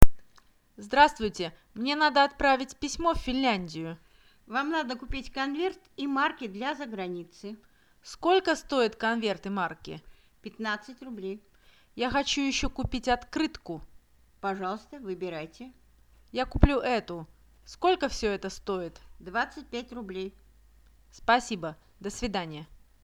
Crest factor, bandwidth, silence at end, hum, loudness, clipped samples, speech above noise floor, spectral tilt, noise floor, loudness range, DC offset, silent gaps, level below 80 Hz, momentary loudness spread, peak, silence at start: 28 dB; 20 kHz; 0.25 s; none; -29 LUFS; under 0.1%; 32 dB; -4.5 dB/octave; -61 dBFS; 7 LU; under 0.1%; none; -40 dBFS; 18 LU; 0 dBFS; 0 s